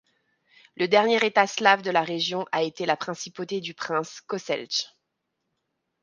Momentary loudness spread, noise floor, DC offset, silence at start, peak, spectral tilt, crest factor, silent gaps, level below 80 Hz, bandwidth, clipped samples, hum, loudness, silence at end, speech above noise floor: 13 LU; -80 dBFS; under 0.1%; 0.8 s; -4 dBFS; -3 dB/octave; 24 dB; none; -78 dBFS; 10 kHz; under 0.1%; none; -25 LUFS; 1.15 s; 55 dB